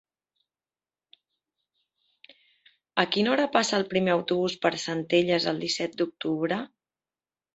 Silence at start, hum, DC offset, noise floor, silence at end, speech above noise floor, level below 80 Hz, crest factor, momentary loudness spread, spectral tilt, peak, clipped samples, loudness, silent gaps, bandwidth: 2.95 s; none; under 0.1%; under -90 dBFS; 0.9 s; over 64 dB; -70 dBFS; 24 dB; 7 LU; -4.5 dB/octave; -4 dBFS; under 0.1%; -26 LUFS; none; 8.2 kHz